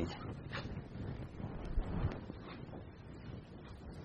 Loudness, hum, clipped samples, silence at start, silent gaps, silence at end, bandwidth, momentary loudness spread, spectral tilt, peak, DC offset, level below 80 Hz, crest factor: -46 LUFS; none; under 0.1%; 0 s; none; 0 s; 9 kHz; 11 LU; -7.5 dB/octave; -24 dBFS; under 0.1%; -48 dBFS; 20 dB